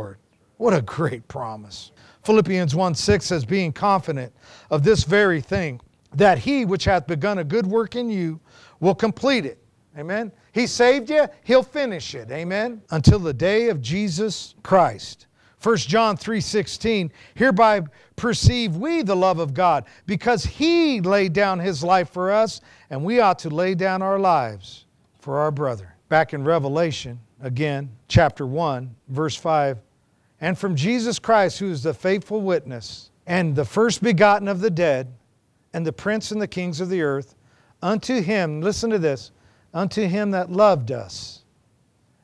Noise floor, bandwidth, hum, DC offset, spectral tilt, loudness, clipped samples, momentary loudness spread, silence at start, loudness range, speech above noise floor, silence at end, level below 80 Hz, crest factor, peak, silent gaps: -63 dBFS; 11 kHz; none; under 0.1%; -5.5 dB/octave; -21 LUFS; under 0.1%; 14 LU; 0 s; 4 LU; 42 dB; 0.9 s; -44 dBFS; 20 dB; 0 dBFS; none